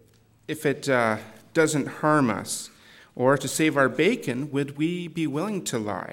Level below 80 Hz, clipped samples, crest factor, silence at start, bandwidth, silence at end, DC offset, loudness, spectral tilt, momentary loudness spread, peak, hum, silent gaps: -68 dBFS; under 0.1%; 18 dB; 0.5 s; 17 kHz; 0 s; under 0.1%; -25 LUFS; -5 dB/octave; 9 LU; -8 dBFS; none; none